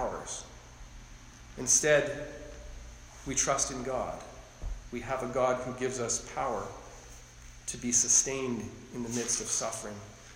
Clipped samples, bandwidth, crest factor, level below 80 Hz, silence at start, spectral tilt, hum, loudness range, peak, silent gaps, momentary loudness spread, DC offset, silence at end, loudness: under 0.1%; 16 kHz; 22 dB; -50 dBFS; 0 s; -2.5 dB/octave; none; 5 LU; -12 dBFS; none; 25 LU; under 0.1%; 0 s; -30 LUFS